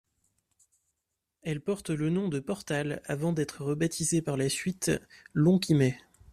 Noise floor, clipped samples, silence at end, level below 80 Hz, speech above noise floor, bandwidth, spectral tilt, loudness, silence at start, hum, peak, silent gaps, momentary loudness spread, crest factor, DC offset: -85 dBFS; under 0.1%; 0.3 s; -62 dBFS; 56 dB; 14.5 kHz; -5.5 dB/octave; -29 LUFS; 1.45 s; none; -12 dBFS; none; 10 LU; 18 dB; under 0.1%